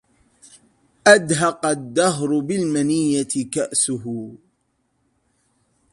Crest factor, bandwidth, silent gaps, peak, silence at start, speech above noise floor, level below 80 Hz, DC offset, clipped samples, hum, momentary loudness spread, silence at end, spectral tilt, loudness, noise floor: 22 dB; 11.5 kHz; none; 0 dBFS; 1.05 s; 50 dB; -62 dBFS; under 0.1%; under 0.1%; none; 12 LU; 1.55 s; -4 dB/octave; -19 LUFS; -69 dBFS